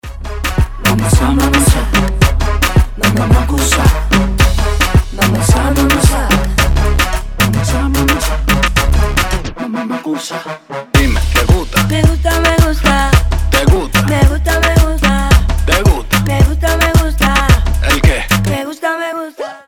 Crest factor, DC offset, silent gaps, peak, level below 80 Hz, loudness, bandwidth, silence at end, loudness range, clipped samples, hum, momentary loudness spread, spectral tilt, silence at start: 12 dB; under 0.1%; none; 0 dBFS; -14 dBFS; -12 LUFS; 19 kHz; 0.1 s; 3 LU; under 0.1%; none; 7 LU; -5 dB/octave; 0.05 s